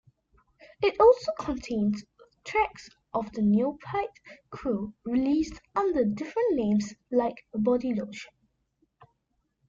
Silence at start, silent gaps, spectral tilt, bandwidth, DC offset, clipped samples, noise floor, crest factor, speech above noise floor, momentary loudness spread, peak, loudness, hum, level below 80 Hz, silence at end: 0.8 s; none; -7 dB/octave; 7.6 kHz; under 0.1%; under 0.1%; -77 dBFS; 20 dB; 50 dB; 12 LU; -8 dBFS; -28 LUFS; none; -56 dBFS; 1.45 s